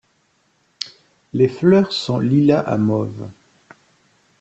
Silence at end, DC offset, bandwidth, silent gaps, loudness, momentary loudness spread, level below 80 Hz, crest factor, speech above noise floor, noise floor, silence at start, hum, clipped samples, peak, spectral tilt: 1.1 s; under 0.1%; 8.2 kHz; none; -17 LUFS; 16 LU; -58 dBFS; 18 dB; 46 dB; -62 dBFS; 0.8 s; none; under 0.1%; -2 dBFS; -7.5 dB/octave